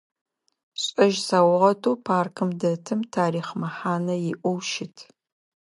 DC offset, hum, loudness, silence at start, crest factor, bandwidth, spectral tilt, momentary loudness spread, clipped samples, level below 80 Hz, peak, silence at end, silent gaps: under 0.1%; none; -24 LUFS; 0.75 s; 20 dB; 11.5 kHz; -5.5 dB/octave; 10 LU; under 0.1%; -74 dBFS; -4 dBFS; 0.6 s; none